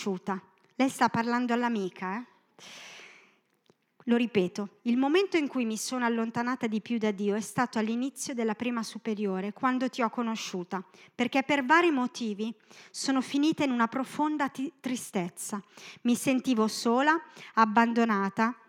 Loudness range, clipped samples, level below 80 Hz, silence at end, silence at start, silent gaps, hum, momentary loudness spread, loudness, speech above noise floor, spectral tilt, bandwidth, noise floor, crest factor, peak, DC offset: 4 LU; under 0.1%; -82 dBFS; 0.15 s; 0 s; none; none; 12 LU; -29 LUFS; 40 dB; -4.5 dB/octave; 16 kHz; -68 dBFS; 22 dB; -8 dBFS; under 0.1%